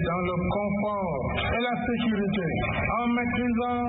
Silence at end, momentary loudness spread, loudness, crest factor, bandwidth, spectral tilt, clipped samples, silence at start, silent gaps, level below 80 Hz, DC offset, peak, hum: 0 s; 2 LU; -27 LUFS; 12 dB; 4 kHz; -11 dB/octave; under 0.1%; 0 s; none; -42 dBFS; under 0.1%; -14 dBFS; none